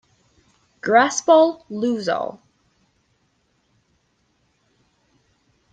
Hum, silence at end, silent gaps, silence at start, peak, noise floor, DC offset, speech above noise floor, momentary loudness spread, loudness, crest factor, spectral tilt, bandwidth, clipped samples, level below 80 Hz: none; 3.4 s; none; 0.85 s; -2 dBFS; -66 dBFS; under 0.1%; 48 dB; 13 LU; -19 LUFS; 20 dB; -3.5 dB/octave; 9.2 kHz; under 0.1%; -70 dBFS